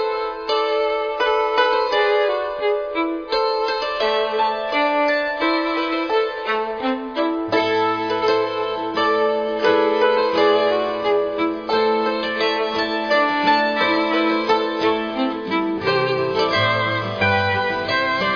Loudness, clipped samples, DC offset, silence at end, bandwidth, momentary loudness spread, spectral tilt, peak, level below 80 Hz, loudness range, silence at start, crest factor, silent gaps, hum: -19 LUFS; under 0.1%; under 0.1%; 0 s; 5.4 kHz; 5 LU; -5.5 dB/octave; -4 dBFS; -54 dBFS; 2 LU; 0 s; 14 dB; none; none